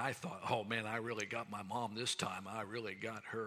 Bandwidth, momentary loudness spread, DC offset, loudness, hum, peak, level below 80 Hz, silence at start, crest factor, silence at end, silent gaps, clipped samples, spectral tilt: 16 kHz; 6 LU; under 0.1%; -41 LUFS; none; -20 dBFS; -82 dBFS; 0 s; 22 dB; 0 s; none; under 0.1%; -3.5 dB/octave